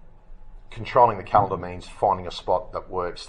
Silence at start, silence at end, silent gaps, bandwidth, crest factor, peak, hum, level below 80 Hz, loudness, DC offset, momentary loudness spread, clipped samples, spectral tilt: 0.05 s; 0 s; none; 10.5 kHz; 22 dB; -2 dBFS; none; -44 dBFS; -23 LUFS; under 0.1%; 15 LU; under 0.1%; -6 dB/octave